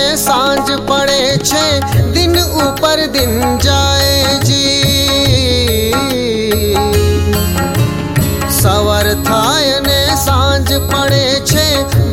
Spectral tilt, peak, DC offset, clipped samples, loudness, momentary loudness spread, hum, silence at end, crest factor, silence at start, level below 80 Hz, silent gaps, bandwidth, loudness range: -4 dB/octave; 0 dBFS; under 0.1%; under 0.1%; -11 LUFS; 4 LU; none; 0 s; 12 dB; 0 s; -24 dBFS; none; 17 kHz; 2 LU